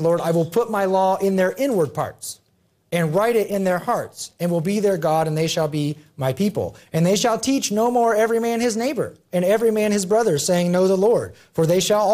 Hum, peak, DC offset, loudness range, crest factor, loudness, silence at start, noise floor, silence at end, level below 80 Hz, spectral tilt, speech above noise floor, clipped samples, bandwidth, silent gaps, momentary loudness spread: none; -8 dBFS; under 0.1%; 3 LU; 12 dB; -20 LUFS; 0 s; -63 dBFS; 0 s; -60 dBFS; -5 dB/octave; 44 dB; under 0.1%; 15.5 kHz; none; 9 LU